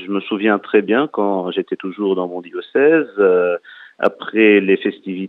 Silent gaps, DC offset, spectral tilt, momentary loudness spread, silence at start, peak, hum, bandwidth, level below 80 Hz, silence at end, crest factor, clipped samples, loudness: none; under 0.1%; -8.5 dB/octave; 10 LU; 0 s; 0 dBFS; none; 4.2 kHz; -74 dBFS; 0 s; 16 dB; under 0.1%; -17 LUFS